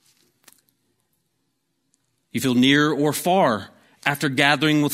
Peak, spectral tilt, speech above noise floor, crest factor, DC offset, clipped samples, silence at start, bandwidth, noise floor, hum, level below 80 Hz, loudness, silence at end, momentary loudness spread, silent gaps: 0 dBFS; -4.5 dB/octave; 54 dB; 22 dB; under 0.1%; under 0.1%; 2.35 s; 16 kHz; -73 dBFS; none; -64 dBFS; -19 LUFS; 0 s; 9 LU; none